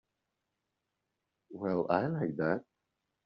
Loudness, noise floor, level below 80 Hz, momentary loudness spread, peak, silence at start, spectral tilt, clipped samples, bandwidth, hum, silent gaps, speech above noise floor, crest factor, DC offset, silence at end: -33 LUFS; -86 dBFS; -74 dBFS; 8 LU; -14 dBFS; 1.5 s; -7 dB/octave; under 0.1%; 5.8 kHz; none; none; 53 dB; 22 dB; under 0.1%; 0.65 s